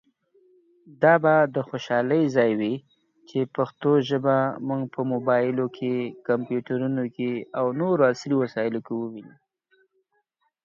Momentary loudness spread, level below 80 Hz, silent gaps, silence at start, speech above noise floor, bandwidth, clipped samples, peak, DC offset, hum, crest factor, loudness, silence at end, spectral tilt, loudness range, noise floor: 9 LU; -72 dBFS; none; 0.9 s; 49 dB; 7.4 kHz; under 0.1%; -4 dBFS; under 0.1%; none; 20 dB; -24 LUFS; 1.35 s; -7.5 dB/octave; 3 LU; -72 dBFS